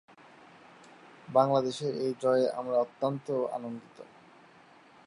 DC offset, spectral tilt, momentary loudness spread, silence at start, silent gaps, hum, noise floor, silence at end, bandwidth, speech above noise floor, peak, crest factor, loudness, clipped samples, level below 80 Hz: under 0.1%; -6.5 dB/octave; 16 LU; 1.3 s; none; none; -57 dBFS; 1 s; 11 kHz; 28 dB; -10 dBFS; 22 dB; -30 LUFS; under 0.1%; -82 dBFS